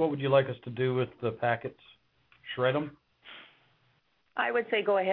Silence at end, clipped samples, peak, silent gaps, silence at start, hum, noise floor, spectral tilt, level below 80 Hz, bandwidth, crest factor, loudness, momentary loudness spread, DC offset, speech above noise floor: 0 s; under 0.1%; -12 dBFS; none; 0 s; none; -71 dBFS; -9.5 dB/octave; -72 dBFS; 5 kHz; 20 dB; -30 LUFS; 22 LU; under 0.1%; 42 dB